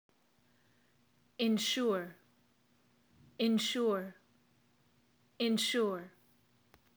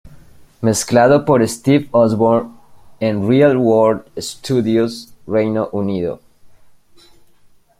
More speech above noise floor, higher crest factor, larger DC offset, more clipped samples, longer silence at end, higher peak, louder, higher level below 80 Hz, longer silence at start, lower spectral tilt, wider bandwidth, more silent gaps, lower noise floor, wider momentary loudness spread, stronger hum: first, 39 dB vs 34 dB; about the same, 18 dB vs 16 dB; neither; neither; second, 0.9 s vs 1.35 s; second, -20 dBFS vs -2 dBFS; second, -34 LUFS vs -15 LUFS; second, -86 dBFS vs -52 dBFS; first, 1.4 s vs 0.05 s; second, -3.5 dB/octave vs -6 dB/octave; first, over 20 kHz vs 16 kHz; neither; first, -72 dBFS vs -49 dBFS; about the same, 14 LU vs 12 LU; neither